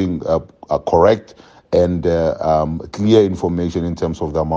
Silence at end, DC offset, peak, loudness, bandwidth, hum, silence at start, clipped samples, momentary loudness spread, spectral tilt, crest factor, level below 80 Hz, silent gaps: 0 s; under 0.1%; 0 dBFS; -17 LUFS; 7.8 kHz; none; 0 s; under 0.1%; 8 LU; -7.5 dB/octave; 16 dB; -40 dBFS; none